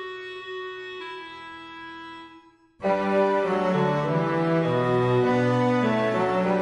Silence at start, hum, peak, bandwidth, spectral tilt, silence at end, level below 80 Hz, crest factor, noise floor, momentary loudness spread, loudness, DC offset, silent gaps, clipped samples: 0 s; none; -10 dBFS; 10.5 kHz; -7.5 dB/octave; 0 s; -60 dBFS; 14 dB; -52 dBFS; 17 LU; -24 LUFS; under 0.1%; none; under 0.1%